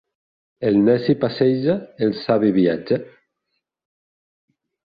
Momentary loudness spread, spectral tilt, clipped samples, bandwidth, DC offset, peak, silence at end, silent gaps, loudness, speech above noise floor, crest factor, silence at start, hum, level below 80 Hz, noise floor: 7 LU; -10 dB/octave; under 0.1%; 5 kHz; under 0.1%; -4 dBFS; 1.8 s; none; -19 LUFS; 58 dB; 18 dB; 0.6 s; none; -60 dBFS; -76 dBFS